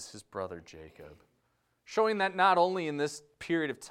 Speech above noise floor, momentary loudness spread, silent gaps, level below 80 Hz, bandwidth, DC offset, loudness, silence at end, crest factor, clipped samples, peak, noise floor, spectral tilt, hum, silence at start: 44 dB; 22 LU; none; -70 dBFS; 14 kHz; under 0.1%; -30 LUFS; 0 s; 20 dB; under 0.1%; -12 dBFS; -75 dBFS; -4.5 dB/octave; none; 0 s